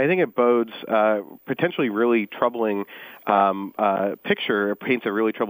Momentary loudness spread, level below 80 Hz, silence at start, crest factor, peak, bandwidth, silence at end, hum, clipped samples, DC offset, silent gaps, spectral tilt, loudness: 6 LU; -72 dBFS; 0 s; 18 dB; -4 dBFS; 16 kHz; 0 s; none; under 0.1%; under 0.1%; none; -8 dB/octave; -22 LUFS